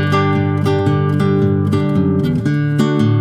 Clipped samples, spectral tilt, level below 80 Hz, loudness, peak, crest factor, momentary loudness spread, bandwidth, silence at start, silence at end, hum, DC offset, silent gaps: under 0.1%; -8.5 dB/octave; -46 dBFS; -15 LUFS; -2 dBFS; 12 dB; 2 LU; 10.5 kHz; 0 s; 0 s; none; under 0.1%; none